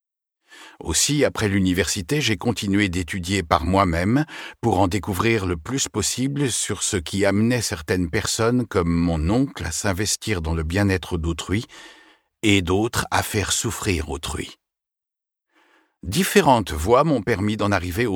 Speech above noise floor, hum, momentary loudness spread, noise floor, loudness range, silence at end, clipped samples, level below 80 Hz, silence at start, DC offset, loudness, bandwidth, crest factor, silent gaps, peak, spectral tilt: 66 dB; none; 7 LU; -87 dBFS; 3 LU; 0 s; under 0.1%; -38 dBFS; 0.5 s; under 0.1%; -21 LUFS; 19 kHz; 22 dB; none; 0 dBFS; -4.5 dB/octave